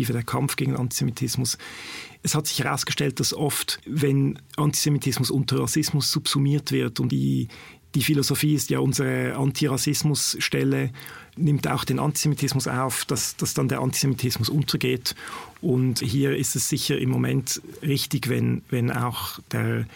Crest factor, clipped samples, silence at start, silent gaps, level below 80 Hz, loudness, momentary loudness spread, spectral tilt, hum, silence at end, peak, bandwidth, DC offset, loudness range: 14 dB; under 0.1%; 0 s; none; -54 dBFS; -24 LUFS; 6 LU; -4.5 dB/octave; none; 0 s; -10 dBFS; 17 kHz; under 0.1%; 2 LU